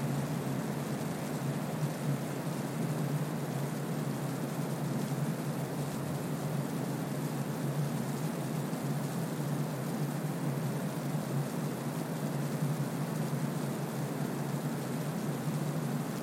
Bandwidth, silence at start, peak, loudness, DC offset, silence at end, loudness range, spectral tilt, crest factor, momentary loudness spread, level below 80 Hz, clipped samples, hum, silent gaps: 16.5 kHz; 0 s; -20 dBFS; -35 LUFS; under 0.1%; 0 s; 0 LU; -6.5 dB/octave; 14 dB; 2 LU; -70 dBFS; under 0.1%; none; none